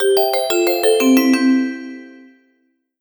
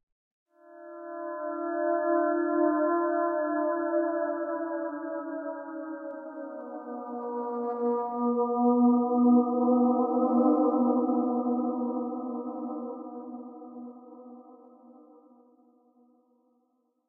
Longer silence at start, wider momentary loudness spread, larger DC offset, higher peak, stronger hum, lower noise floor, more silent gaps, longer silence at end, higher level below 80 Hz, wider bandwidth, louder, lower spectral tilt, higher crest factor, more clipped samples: second, 0 s vs 0.7 s; about the same, 18 LU vs 18 LU; neither; first, -2 dBFS vs -12 dBFS; neither; second, -64 dBFS vs -73 dBFS; neither; second, 0.9 s vs 2.15 s; first, -66 dBFS vs under -90 dBFS; first, 19.5 kHz vs 1.9 kHz; first, -15 LUFS vs -28 LUFS; second, -2 dB/octave vs -11.5 dB/octave; about the same, 14 dB vs 18 dB; neither